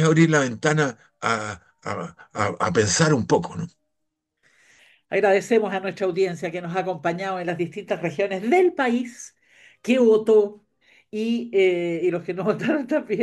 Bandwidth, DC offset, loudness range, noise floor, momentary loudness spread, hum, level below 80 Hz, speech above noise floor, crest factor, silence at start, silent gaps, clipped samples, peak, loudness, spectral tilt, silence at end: 12 kHz; under 0.1%; 3 LU; -78 dBFS; 14 LU; none; -62 dBFS; 56 dB; 18 dB; 0 s; none; under 0.1%; -4 dBFS; -22 LUFS; -5.5 dB/octave; 0 s